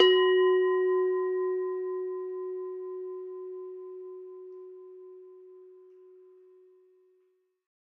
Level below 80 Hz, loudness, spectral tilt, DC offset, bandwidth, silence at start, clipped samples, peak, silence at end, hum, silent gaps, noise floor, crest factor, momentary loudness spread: under -90 dBFS; -29 LUFS; -3.5 dB/octave; under 0.1%; 5.4 kHz; 0 s; under 0.1%; -8 dBFS; 2.25 s; none; none; -71 dBFS; 22 dB; 25 LU